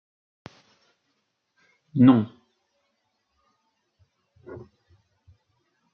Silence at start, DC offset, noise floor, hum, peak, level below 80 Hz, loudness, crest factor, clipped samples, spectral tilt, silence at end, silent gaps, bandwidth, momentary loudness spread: 1.95 s; under 0.1%; -75 dBFS; none; -4 dBFS; -70 dBFS; -20 LUFS; 24 dB; under 0.1%; -8 dB/octave; 1.4 s; none; 4.5 kHz; 27 LU